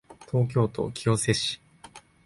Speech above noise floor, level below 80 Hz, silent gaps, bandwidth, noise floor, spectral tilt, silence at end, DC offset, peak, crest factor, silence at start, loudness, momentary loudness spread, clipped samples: 25 dB; -54 dBFS; none; 11.5 kHz; -51 dBFS; -5 dB/octave; 0.25 s; under 0.1%; -8 dBFS; 20 dB; 0.1 s; -26 LUFS; 6 LU; under 0.1%